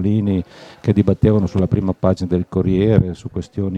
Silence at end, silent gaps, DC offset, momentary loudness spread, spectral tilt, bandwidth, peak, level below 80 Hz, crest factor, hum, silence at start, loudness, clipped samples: 0 s; none; under 0.1%; 9 LU; -9.5 dB/octave; 8.4 kHz; 0 dBFS; -38 dBFS; 16 dB; none; 0 s; -18 LUFS; under 0.1%